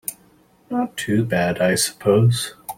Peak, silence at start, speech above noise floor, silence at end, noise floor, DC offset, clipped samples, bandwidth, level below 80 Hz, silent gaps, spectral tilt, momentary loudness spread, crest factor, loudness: -4 dBFS; 0.1 s; 36 dB; 0.05 s; -55 dBFS; under 0.1%; under 0.1%; 16.5 kHz; -56 dBFS; none; -5 dB/octave; 9 LU; 16 dB; -20 LUFS